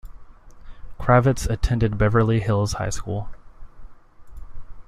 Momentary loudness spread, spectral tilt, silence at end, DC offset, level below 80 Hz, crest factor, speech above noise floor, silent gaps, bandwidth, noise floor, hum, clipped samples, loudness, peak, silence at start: 12 LU; -6.5 dB/octave; 0.05 s; under 0.1%; -34 dBFS; 20 dB; 22 dB; none; 14 kHz; -41 dBFS; none; under 0.1%; -21 LUFS; -2 dBFS; 0.05 s